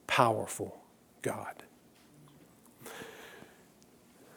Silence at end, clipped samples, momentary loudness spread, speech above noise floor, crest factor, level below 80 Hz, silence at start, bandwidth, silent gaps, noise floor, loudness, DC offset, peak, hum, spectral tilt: 0 s; under 0.1%; 26 LU; 29 dB; 28 dB; -74 dBFS; 0.1 s; over 20 kHz; none; -61 dBFS; -35 LUFS; under 0.1%; -10 dBFS; none; -4 dB/octave